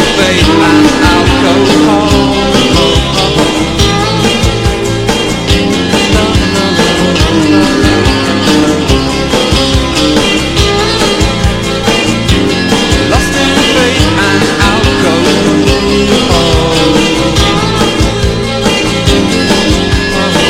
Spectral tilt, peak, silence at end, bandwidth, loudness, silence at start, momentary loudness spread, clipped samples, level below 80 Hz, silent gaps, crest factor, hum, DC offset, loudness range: -4.5 dB/octave; 0 dBFS; 0 s; 17 kHz; -8 LUFS; 0 s; 3 LU; 1%; -18 dBFS; none; 8 dB; none; under 0.1%; 2 LU